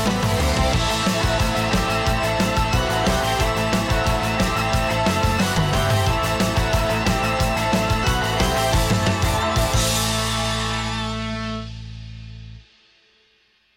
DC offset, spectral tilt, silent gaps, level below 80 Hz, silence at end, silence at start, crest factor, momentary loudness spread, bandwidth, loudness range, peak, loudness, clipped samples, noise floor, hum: under 0.1%; -4.5 dB/octave; none; -28 dBFS; 1.15 s; 0 s; 14 dB; 7 LU; 17 kHz; 4 LU; -8 dBFS; -20 LUFS; under 0.1%; -61 dBFS; none